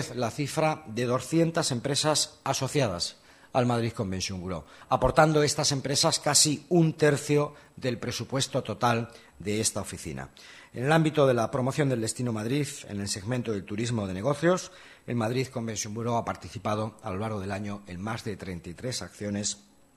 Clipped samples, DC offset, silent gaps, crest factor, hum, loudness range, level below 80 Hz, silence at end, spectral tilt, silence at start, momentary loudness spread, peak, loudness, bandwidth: under 0.1%; under 0.1%; none; 22 dB; none; 8 LU; -54 dBFS; 0.4 s; -4 dB/octave; 0 s; 14 LU; -6 dBFS; -28 LUFS; 13 kHz